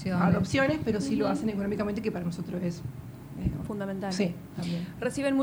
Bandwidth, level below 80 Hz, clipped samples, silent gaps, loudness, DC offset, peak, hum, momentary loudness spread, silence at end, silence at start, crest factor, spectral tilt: 19.5 kHz; -50 dBFS; under 0.1%; none; -30 LUFS; under 0.1%; -12 dBFS; none; 9 LU; 0 s; 0 s; 18 dB; -6.5 dB/octave